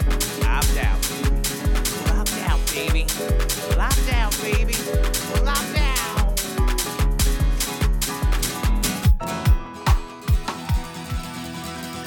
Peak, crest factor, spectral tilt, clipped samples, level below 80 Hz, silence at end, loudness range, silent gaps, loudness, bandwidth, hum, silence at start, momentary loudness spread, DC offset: -6 dBFS; 14 dB; -4 dB/octave; under 0.1%; -22 dBFS; 0 s; 1 LU; none; -23 LUFS; 19 kHz; none; 0 s; 5 LU; under 0.1%